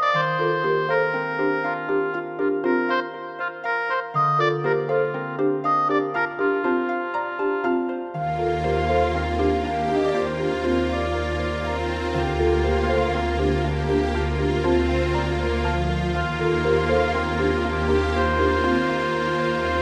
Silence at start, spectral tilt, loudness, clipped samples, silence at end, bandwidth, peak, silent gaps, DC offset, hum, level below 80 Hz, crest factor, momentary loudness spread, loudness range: 0 s; -7 dB/octave; -23 LUFS; under 0.1%; 0 s; 10 kHz; -8 dBFS; none; under 0.1%; none; -32 dBFS; 14 dB; 5 LU; 2 LU